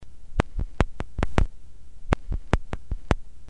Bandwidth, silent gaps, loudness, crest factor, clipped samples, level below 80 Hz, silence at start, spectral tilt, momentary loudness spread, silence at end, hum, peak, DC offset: 10.5 kHz; none; -30 LUFS; 26 dB; under 0.1%; -30 dBFS; 0 s; -6.5 dB/octave; 7 LU; 0 s; none; 0 dBFS; 2%